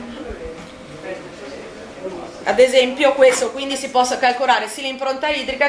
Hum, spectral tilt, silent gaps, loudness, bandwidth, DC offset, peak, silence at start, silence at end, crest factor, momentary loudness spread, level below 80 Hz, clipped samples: none; -2 dB/octave; none; -17 LUFS; 11 kHz; under 0.1%; -2 dBFS; 0 s; 0 s; 18 dB; 20 LU; -48 dBFS; under 0.1%